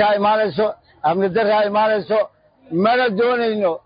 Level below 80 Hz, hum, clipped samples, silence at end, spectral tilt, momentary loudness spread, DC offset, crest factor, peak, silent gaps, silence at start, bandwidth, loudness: -60 dBFS; none; under 0.1%; 0.05 s; -10.5 dB/octave; 6 LU; under 0.1%; 14 dB; -4 dBFS; none; 0 s; 5.2 kHz; -18 LUFS